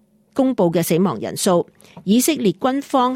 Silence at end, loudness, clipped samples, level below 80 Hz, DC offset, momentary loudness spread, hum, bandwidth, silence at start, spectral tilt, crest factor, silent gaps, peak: 0 s; -19 LUFS; under 0.1%; -62 dBFS; under 0.1%; 7 LU; none; 17 kHz; 0.35 s; -5 dB/octave; 14 dB; none; -6 dBFS